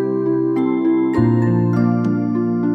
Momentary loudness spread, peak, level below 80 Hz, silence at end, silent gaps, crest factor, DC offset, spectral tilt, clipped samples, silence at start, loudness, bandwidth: 3 LU; -4 dBFS; -48 dBFS; 0 s; none; 14 dB; under 0.1%; -10.5 dB/octave; under 0.1%; 0 s; -17 LUFS; 6 kHz